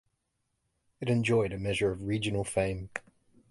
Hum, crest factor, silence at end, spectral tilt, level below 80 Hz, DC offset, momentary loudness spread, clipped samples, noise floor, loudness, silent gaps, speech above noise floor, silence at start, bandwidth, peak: none; 18 dB; 0.5 s; -5.5 dB/octave; -52 dBFS; under 0.1%; 12 LU; under 0.1%; -80 dBFS; -30 LUFS; none; 50 dB; 1 s; 11.5 kHz; -14 dBFS